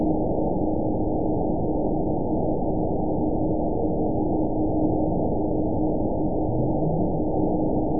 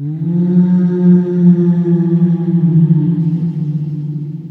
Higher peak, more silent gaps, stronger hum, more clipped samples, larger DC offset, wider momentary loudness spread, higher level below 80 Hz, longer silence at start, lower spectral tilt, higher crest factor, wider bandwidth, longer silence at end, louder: second, -10 dBFS vs 0 dBFS; neither; neither; neither; first, 3% vs under 0.1%; second, 2 LU vs 9 LU; first, -34 dBFS vs -56 dBFS; about the same, 0 s vs 0 s; first, -19 dB/octave vs -12.5 dB/octave; about the same, 12 dB vs 12 dB; second, 1 kHz vs 2 kHz; about the same, 0 s vs 0 s; second, -25 LUFS vs -13 LUFS